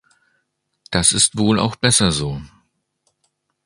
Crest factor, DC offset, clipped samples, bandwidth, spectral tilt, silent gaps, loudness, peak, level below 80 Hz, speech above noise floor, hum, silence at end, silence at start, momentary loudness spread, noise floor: 20 dB; under 0.1%; under 0.1%; 11.5 kHz; -3 dB/octave; none; -16 LUFS; 0 dBFS; -42 dBFS; 54 dB; none; 1.2 s; 0.9 s; 11 LU; -71 dBFS